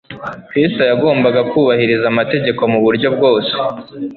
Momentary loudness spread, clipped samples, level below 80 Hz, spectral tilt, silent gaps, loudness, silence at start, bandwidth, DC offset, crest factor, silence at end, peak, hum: 8 LU; under 0.1%; -54 dBFS; -9 dB/octave; none; -14 LUFS; 0.1 s; 4.6 kHz; under 0.1%; 12 dB; 0 s; -2 dBFS; none